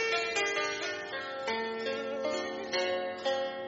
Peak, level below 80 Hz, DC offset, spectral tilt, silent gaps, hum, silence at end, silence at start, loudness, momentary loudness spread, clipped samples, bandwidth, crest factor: -16 dBFS; -74 dBFS; under 0.1%; 0 dB/octave; none; none; 0 s; 0 s; -33 LUFS; 6 LU; under 0.1%; 7.6 kHz; 16 dB